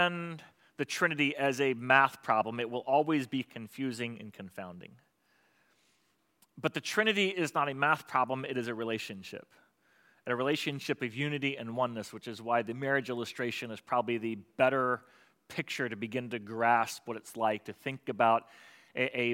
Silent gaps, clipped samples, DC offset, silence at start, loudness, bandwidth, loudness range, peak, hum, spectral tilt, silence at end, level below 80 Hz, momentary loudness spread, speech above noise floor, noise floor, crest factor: none; under 0.1%; under 0.1%; 0 s; -32 LUFS; 16.5 kHz; 6 LU; -8 dBFS; none; -4.5 dB/octave; 0 s; -84 dBFS; 14 LU; 42 dB; -74 dBFS; 24 dB